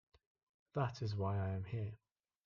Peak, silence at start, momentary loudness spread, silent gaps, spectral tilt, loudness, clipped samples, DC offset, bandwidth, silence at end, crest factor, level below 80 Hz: -24 dBFS; 0.75 s; 8 LU; none; -8 dB/octave; -42 LUFS; under 0.1%; under 0.1%; 7 kHz; 0.5 s; 18 dB; -72 dBFS